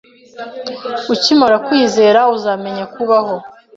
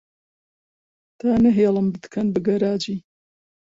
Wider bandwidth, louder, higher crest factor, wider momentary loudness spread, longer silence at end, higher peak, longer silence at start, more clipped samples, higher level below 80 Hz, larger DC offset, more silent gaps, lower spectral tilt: about the same, 7.8 kHz vs 7.6 kHz; first, -13 LUFS vs -21 LUFS; about the same, 14 dB vs 16 dB; first, 15 LU vs 10 LU; second, 0.25 s vs 0.8 s; first, 0 dBFS vs -6 dBFS; second, 0.35 s vs 1.25 s; neither; second, -58 dBFS vs -52 dBFS; neither; neither; second, -4 dB/octave vs -7.5 dB/octave